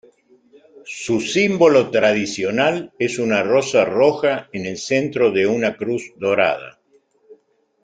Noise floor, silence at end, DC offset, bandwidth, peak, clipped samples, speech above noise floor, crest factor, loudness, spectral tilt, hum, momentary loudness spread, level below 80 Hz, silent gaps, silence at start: -59 dBFS; 0.5 s; under 0.1%; 9.4 kHz; -2 dBFS; under 0.1%; 41 dB; 18 dB; -18 LUFS; -4.5 dB/octave; none; 10 LU; -60 dBFS; none; 0.85 s